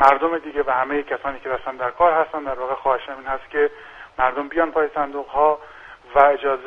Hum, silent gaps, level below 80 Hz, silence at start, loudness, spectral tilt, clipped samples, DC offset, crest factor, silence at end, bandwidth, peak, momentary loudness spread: none; none; -50 dBFS; 0 s; -21 LUFS; -6 dB/octave; under 0.1%; under 0.1%; 20 dB; 0 s; 7.6 kHz; 0 dBFS; 11 LU